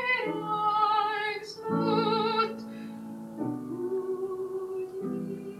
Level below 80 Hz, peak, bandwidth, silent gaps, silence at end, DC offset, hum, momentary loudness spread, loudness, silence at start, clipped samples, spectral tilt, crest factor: -74 dBFS; -14 dBFS; 15 kHz; none; 0 s; under 0.1%; none; 14 LU; -30 LUFS; 0 s; under 0.1%; -6 dB/octave; 18 dB